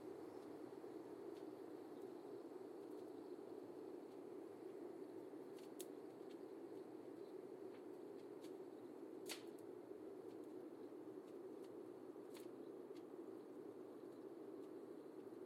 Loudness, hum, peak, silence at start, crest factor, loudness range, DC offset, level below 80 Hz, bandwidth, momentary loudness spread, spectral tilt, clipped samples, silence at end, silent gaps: -56 LUFS; none; -34 dBFS; 0 s; 20 dB; 1 LU; under 0.1%; under -90 dBFS; 16 kHz; 2 LU; -5 dB/octave; under 0.1%; 0 s; none